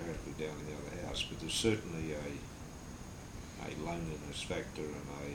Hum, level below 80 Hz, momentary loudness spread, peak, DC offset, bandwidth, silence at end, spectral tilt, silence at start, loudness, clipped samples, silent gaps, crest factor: none; -52 dBFS; 14 LU; -18 dBFS; under 0.1%; over 20 kHz; 0 s; -4 dB/octave; 0 s; -40 LUFS; under 0.1%; none; 22 dB